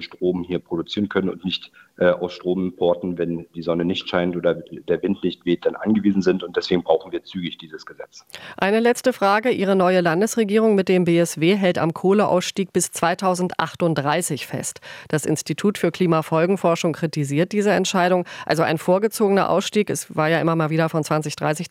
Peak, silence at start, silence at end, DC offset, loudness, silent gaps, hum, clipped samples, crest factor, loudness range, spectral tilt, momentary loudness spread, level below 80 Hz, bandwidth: -2 dBFS; 0 s; 0.05 s; under 0.1%; -21 LUFS; none; none; under 0.1%; 18 dB; 5 LU; -5 dB/octave; 9 LU; -62 dBFS; 16.5 kHz